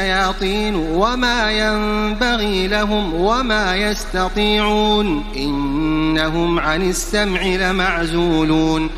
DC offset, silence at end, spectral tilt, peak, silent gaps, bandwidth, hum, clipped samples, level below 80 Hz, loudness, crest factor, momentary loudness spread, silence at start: under 0.1%; 0 s; -4.5 dB/octave; -2 dBFS; none; 15.5 kHz; none; under 0.1%; -28 dBFS; -17 LUFS; 14 dB; 4 LU; 0 s